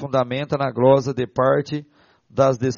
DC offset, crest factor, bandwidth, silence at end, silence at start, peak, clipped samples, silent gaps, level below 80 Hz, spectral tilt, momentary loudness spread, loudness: under 0.1%; 18 dB; 7.2 kHz; 0 s; 0 s; -2 dBFS; under 0.1%; none; -58 dBFS; -6 dB/octave; 13 LU; -20 LUFS